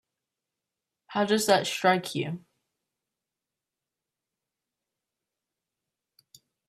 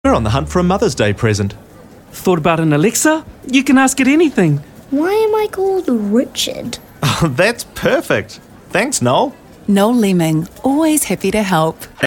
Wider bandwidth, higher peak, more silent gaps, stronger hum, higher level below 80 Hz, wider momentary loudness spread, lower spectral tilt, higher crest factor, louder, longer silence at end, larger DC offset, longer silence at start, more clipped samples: second, 15 kHz vs 18 kHz; second, -8 dBFS vs 0 dBFS; neither; neither; second, -76 dBFS vs -38 dBFS; first, 12 LU vs 8 LU; about the same, -4 dB/octave vs -5 dB/octave; first, 26 dB vs 14 dB; second, -26 LUFS vs -15 LUFS; first, 4.3 s vs 0 s; neither; first, 1.1 s vs 0.05 s; neither